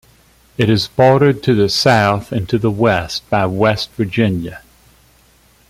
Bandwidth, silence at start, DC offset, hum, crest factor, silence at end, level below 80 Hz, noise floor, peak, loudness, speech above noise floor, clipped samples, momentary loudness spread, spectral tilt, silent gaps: 15.5 kHz; 0.6 s; under 0.1%; none; 14 dB; 1.1 s; -44 dBFS; -51 dBFS; 0 dBFS; -15 LUFS; 37 dB; under 0.1%; 8 LU; -6 dB/octave; none